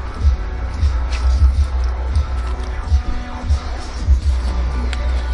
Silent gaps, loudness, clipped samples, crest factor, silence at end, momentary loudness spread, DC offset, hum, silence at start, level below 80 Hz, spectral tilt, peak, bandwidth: none; -20 LUFS; under 0.1%; 14 dB; 0 s; 8 LU; under 0.1%; none; 0 s; -18 dBFS; -6.5 dB/octave; -2 dBFS; 9.6 kHz